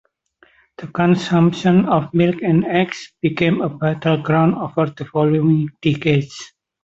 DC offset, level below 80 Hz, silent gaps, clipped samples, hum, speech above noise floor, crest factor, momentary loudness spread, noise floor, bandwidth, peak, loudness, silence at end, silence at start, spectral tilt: under 0.1%; -54 dBFS; none; under 0.1%; none; 39 dB; 14 dB; 7 LU; -56 dBFS; 7.8 kHz; -2 dBFS; -17 LUFS; 0.4 s; 0.8 s; -7.5 dB/octave